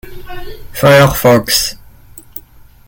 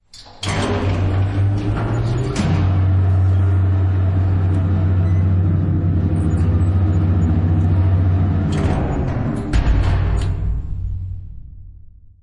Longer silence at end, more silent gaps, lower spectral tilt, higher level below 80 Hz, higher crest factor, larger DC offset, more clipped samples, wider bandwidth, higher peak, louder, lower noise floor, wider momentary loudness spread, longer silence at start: first, 0.5 s vs 0.35 s; neither; second, -4.5 dB/octave vs -8 dB/octave; second, -34 dBFS vs -26 dBFS; about the same, 14 dB vs 12 dB; neither; neither; first, 17.5 kHz vs 9.2 kHz; first, 0 dBFS vs -4 dBFS; first, -10 LUFS vs -18 LUFS; about the same, -39 dBFS vs -41 dBFS; first, 23 LU vs 7 LU; about the same, 0.05 s vs 0.15 s